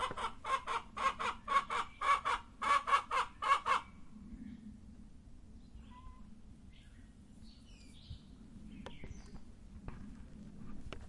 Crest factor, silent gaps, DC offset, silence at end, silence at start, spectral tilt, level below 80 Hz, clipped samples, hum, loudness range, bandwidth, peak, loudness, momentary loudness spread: 22 dB; none; under 0.1%; 0 s; 0 s; -3 dB/octave; -56 dBFS; under 0.1%; none; 23 LU; 11.5 kHz; -18 dBFS; -35 LUFS; 25 LU